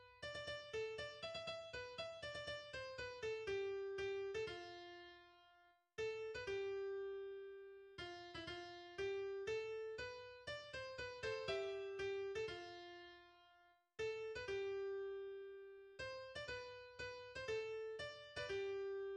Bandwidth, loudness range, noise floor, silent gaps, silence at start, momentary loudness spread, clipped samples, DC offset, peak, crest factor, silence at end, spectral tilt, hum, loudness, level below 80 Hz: 9.6 kHz; 2 LU; -73 dBFS; none; 0 s; 11 LU; under 0.1%; under 0.1%; -32 dBFS; 16 dB; 0 s; -4 dB/octave; none; -48 LUFS; -72 dBFS